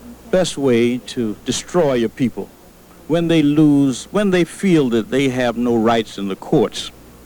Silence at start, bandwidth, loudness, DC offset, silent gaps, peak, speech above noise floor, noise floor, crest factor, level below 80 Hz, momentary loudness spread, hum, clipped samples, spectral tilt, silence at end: 0 s; over 20 kHz; -17 LUFS; under 0.1%; none; -2 dBFS; 27 dB; -44 dBFS; 14 dB; -46 dBFS; 10 LU; none; under 0.1%; -5.5 dB/octave; 0.35 s